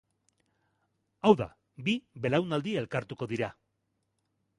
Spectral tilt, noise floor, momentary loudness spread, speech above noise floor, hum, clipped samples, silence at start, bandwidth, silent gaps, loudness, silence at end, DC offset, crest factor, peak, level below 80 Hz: -6.5 dB/octave; -79 dBFS; 11 LU; 50 dB; none; under 0.1%; 1.25 s; 11 kHz; none; -30 LUFS; 1.05 s; under 0.1%; 24 dB; -8 dBFS; -64 dBFS